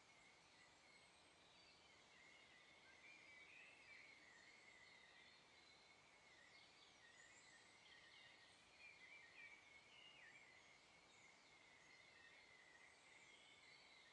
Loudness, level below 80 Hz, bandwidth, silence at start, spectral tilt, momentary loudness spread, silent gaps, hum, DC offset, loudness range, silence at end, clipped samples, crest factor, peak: -66 LUFS; under -90 dBFS; 10 kHz; 0 s; -1.5 dB/octave; 6 LU; none; none; under 0.1%; 3 LU; 0 s; under 0.1%; 16 dB; -52 dBFS